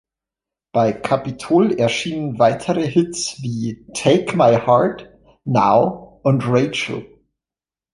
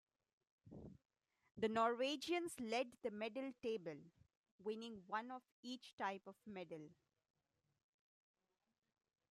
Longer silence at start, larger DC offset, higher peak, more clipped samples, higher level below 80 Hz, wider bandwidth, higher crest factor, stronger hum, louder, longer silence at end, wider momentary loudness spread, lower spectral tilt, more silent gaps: about the same, 0.75 s vs 0.65 s; neither; first, -2 dBFS vs -28 dBFS; neither; first, -54 dBFS vs -84 dBFS; second, 11.5 kHz vs 13.5 kHz; second, 16 dB vs 22 dB; neither; first, -18 LUFS vs -46 LUFS; second, 0.85 s vs 2.35 s; second, 10 LU vs 20 LU; first, -5.5 dB/octave vs -4 dB/octave; second, none vs 4.37-4.44 s, 4.51-4.59 s, 5.52-5.63 s, 5.93-5.98 s